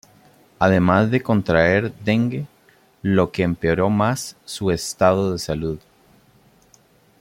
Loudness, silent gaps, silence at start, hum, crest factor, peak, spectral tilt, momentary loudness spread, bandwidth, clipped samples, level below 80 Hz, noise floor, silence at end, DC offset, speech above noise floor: -20 LUFS; none; 0.6 s; none; 18 dB; -2 dBFS; -6 dB/octave; 12 LU; 16.5 kHz; under 0.1%; -48 dBFS; -55 dBFS; 1.4 s; under 0.1%; 37 dB